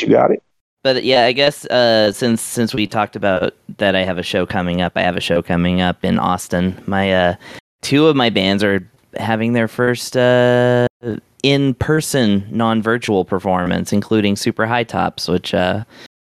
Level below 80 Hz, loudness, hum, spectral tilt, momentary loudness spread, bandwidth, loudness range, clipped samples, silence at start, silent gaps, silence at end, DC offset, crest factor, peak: -50 dBFS; -16 LUFS; none; -5 dB/octave; 7 LU; 14.5 kHz; 2 LU; under 0.1%; 0 s; 0.61-0.77 s, 7.60-7.79 s, 10.90-11.00 s; 0.15 s; under 0.1%; 14 dB; -2 dBFS